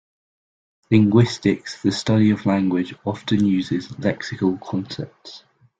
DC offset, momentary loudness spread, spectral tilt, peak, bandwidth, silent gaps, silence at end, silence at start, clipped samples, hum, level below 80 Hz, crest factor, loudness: under 0.1%; 13 LU; -7 dB/octave; -2 dBFS; 9 kHz; none; 0.4 s; 0.9 s; under 0.1%; none; -54 dBFS; 18 dB; -20 LUFS